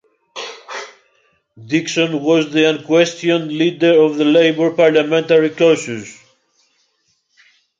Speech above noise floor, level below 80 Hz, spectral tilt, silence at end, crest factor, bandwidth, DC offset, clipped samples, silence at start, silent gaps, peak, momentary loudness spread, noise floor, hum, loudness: 50 dB; -66 dBFS; -5 dB/octave; 1.65 s; 16 dB; 7.8 kHz; under 0.1%; under 0.1%; 0.35 s; none; 0 dBFS; 17 LU; -64 dBFS; none; -14 LUFS